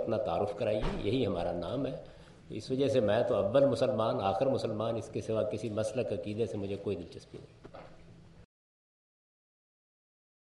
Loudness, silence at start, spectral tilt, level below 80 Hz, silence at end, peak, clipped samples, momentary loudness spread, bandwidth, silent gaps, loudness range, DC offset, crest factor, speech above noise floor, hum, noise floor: -32 LUFS; 0 s; -7 dB/octave; -52 dBFS; 2.05 s; -16 dBFS; under 0.1%; 18 LU; 11.5 kHz; none; 11 LU; under 0.1%; 18 dB; 22 dB; none; -54 dBFS